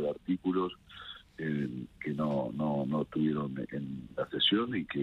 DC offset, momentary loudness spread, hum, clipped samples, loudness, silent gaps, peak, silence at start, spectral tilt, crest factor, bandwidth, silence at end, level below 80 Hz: under 0.1%; 12 LU; none; under 0.1%; -33 LUFS; none; -16 dBFS; 0 s; -7.5 dB/octave; 16 dB; 5.8 kHz; 0 s; -64 dBFS